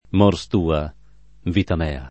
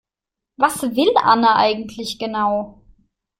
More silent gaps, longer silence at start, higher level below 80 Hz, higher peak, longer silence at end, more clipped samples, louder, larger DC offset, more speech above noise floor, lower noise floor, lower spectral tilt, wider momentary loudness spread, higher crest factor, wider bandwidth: neither; second, 0.15 s vs 0.6 s; first, -34 dBFS vs -56 dBFS; about the same, -2 dBFS vs -2 dBFS; second, 0 s vs 0.7 s; neither; second, -21 LUFS vs -18 LUFS; first, 0.5% vs under 0.1%; second, 23 dB vs 68 dB; second, -42 dBFS vs -85 dBFS; first, -7.5 dB/octave vs -3.5 dB/octave; about the same, 10 LU vs 12 LU; about the same, 20 dB vs 18 dB; second, 8.6 kHz vs 16 kHz